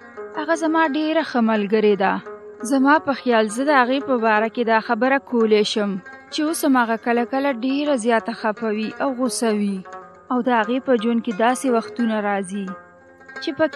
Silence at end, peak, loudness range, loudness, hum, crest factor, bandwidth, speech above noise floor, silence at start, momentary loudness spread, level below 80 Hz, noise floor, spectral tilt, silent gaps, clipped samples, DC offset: 0 s; -2 dBFS; 3 LU; -20 LUFS; none; 18 dB; 13 kHz; 25 dB; 0 s; 12 LU; -72 dBFS; -45 dBFS; -4.5 dB/octave; none; under 0.1%; under 0.1%